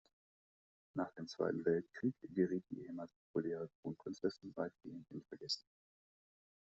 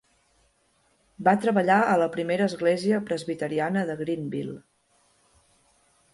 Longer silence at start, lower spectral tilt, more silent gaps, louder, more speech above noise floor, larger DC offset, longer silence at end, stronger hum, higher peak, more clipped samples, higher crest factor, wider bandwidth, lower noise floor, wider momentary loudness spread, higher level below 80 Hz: second, 0.95 s vs 1.2 s; second, -5 dB/octave vs -6.5 dB/octave; first, 3.16-3.34 s, 3.75-3.83 s vs none; second, -43 LUFS vs -25 LUFS; first, over 48 dB vs 43 dB; neither; second, 1 s vs 1.55 s; neither; second, -22 dBFS vs -8 dBFS; neither; about the same, 22 dB vs 18 dB; second, 7.6 kHz vs 11.5 kHz; first, under -90 dBFS vs -67 dBFS; about the same, 12 LU vs 11 LU; second, -80 dBFS vs -68 dBFS